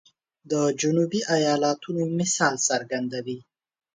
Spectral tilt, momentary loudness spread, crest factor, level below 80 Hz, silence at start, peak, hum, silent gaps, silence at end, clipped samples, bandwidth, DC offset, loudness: -4 dB/octave; 9 LU; 18 dB; -70 dBFS; 0.45 s; -8 dBFS; none; none; 0.55 s; under 0.1%; 10 kHz; under 0.1%; -24 LUFS